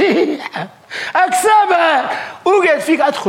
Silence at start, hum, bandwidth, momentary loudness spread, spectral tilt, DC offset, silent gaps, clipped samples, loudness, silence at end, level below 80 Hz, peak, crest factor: 0 s; none; 16.5 kHz; 14 LU; -3 dB/octave; under 0.1%; none; under 0.1%; -14 LUFS; 0 s; -64 dBFS; -4 dBFS; 10 dB